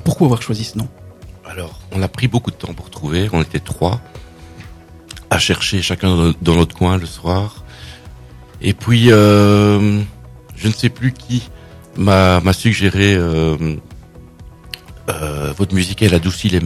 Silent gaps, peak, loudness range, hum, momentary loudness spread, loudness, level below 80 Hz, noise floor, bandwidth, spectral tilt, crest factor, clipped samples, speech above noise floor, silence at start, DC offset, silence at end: none; 0 dBFS; 7 LU; none; 19 LU; -15 LUFS; -38 dBFS; -38 dBFS; 14 kHz; -6 dB/octave; 16 dB; 0.2%; 23 dB; 0 s; under 0.1%; 0 s